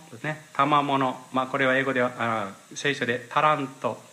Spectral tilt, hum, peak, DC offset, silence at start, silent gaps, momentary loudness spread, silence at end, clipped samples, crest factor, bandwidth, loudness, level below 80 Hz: -5 dB/octave; none; -8 dBFS; under 0.1%; 0 s; none; 9 LU; 0.1 s; under 0.1%; 18 dB; 15.5 kHz; -25 LUFS; -74 dBFS